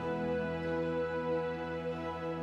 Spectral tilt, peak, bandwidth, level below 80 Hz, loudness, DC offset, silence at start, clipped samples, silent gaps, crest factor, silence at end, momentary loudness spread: -7.5 dB/octave; -24 dBFS; 7.8 kHz; -62 dBFS; -36 LUFS; under 0.1%; 0 s; under 0.1%; none; 10 dB; 0 s; 4 LU